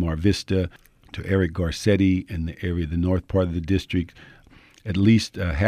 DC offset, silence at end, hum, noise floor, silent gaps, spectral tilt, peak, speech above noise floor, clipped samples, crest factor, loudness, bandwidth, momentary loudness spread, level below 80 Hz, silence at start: under 0.1%; 0 s; none; -51 dBFS; none; -7 dB/octave; -6 dBFS; 28 dB; under 0.1%; 16 dB; -23 LUFS; 13 kHz; 12 LU; -38 dBFS; 0 s